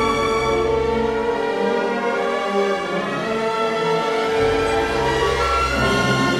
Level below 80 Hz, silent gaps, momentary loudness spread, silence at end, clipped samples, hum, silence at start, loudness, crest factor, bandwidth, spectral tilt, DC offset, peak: -36 dBFS; none; 3 LU; 0 s; under 0.1%; none; 0 s; -20 LUFS; 12 dB; 14 kHz; -5 dB/octave; 0.1%; -6 dBFS